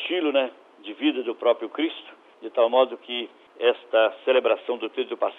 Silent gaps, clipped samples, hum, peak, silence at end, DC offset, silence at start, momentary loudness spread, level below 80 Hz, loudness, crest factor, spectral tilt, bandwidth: none; under 0.1%; none; -6 dBFS; 0.05 s; under 0.1%; 0 s; 12 LU; -84 dBFS; -24 LUFS; 18 dB; -5 dB/octave; 4 kHz